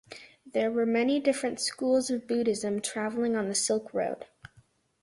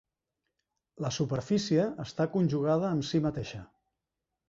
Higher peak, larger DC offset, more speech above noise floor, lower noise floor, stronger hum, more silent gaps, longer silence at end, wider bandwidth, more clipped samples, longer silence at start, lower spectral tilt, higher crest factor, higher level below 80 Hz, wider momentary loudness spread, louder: about the same, -12 dBFS vs -14 dBFS; neither; second, 35 dB vs 58 dB; second, -63 dBFS vs -87 dBFS; neither; neither; about the same, 0.75 s vs 0.85 s; first, 11.5 kHz vs 7.8 kHz; neither; second, 0.1 s vs 1 s; second, -3.5 dB/octave vs -6.5 dB/octave; about the same, 16 dB vs 18 dB; second, -70 dBFS vs -60 dBFS; about the same, 8 LU vs 10 LU; about the same, -29 LUFS vs -30 LUFS